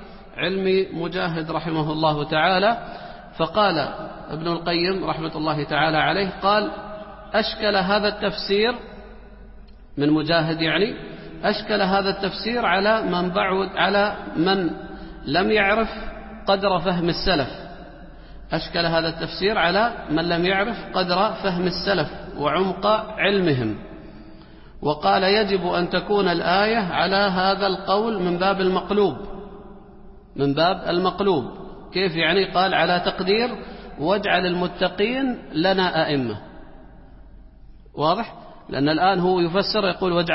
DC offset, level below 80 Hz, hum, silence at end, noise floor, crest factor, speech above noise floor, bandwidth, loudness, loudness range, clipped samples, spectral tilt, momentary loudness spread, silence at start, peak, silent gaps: under 0.1%; -44 dBFS; none; 0 s; -44 dBFS; 18 dB; 23 dB; 5.8 kHz; -21 LUFS; 3 LU; under 0.1%; -9.5 dB/octave; 14 LU; 0 s; -4 dBFS; none